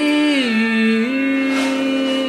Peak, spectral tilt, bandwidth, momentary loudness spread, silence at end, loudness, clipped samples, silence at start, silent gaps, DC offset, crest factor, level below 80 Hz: -6 dBFS; -4.5 dB/octave; 13 kHz; 3 LU; 0 s; -17 LUFS; under 0.1%; 0 s; none; under 0.1%; 12 dB; -64 dBFS